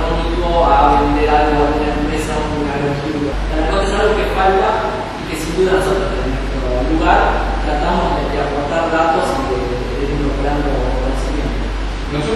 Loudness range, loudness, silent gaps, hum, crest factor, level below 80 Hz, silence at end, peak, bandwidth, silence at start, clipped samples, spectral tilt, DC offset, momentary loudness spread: 3 LU; -16 LUFS; none; none; 16 dB; -22 dBFS; 0 s; 0 dBFS; 12.5 kHz; 0 s; under 0.1%; -6 dB/octave; under 0.1%; 8 LU